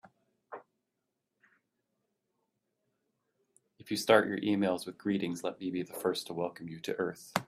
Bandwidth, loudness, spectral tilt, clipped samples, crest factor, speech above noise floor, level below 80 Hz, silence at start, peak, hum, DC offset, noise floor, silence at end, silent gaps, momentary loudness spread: 15.5 kHz; -33 LUFS; -5 dB/octave; under 0.1%; 26 dB; 53 dB; -76 dBFS; 0.5 s; -8 dBFS; none; under 0.1%; -85 dBFS; 0.05 s; none; 17 LU